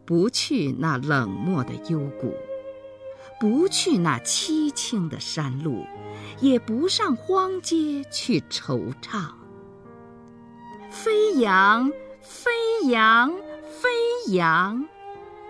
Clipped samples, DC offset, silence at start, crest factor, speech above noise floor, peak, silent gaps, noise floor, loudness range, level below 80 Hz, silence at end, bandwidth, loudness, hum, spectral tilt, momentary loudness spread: under 0.1%; under 0.1%; 0.05 s; 18 dB; 23 dB; -6 dBFS; none; -46 dBFS; 6 LU; -64 dBFS; 0 s; 11 kHz; -23 LUFS; none; -4.5 dB/octave; 19 LU